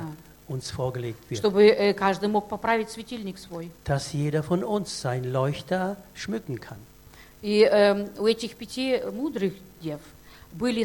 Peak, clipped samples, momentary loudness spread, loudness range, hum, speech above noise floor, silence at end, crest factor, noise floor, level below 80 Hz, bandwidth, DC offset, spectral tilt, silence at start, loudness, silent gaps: -6 dBFS; under 0.1%; 18 LU; 4 LU; none; 25 dB; 0 s; 20 dB; -50 dBFS; -54 dBFS; 17.5 kHz; under 0.1%; -5.5 dB/octave; 0 s; -26 LUFS; none